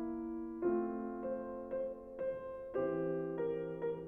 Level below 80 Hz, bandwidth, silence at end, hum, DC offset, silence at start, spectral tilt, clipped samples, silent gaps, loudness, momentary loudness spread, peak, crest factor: -66 dBFS; 3.5 kHz; 0 s; none; under 0.1%; 0 s; -10.5 dB/octave; under 0.1%; none; -40 LUFS; 6 LU; -24 dBFS; 16 dB